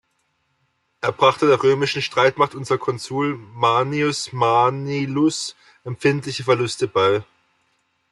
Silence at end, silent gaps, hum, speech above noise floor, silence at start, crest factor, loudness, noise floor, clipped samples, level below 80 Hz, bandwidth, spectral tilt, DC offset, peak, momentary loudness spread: 0.9 s; none; none; 49 dB; 1.05 s; 18 dB; -20 LUFS; -69 dBFS; under 0.1%; -64 dBFS; 12 kHz; -5 dB/octave; under 0.1%; -2 dBFS; 8 LU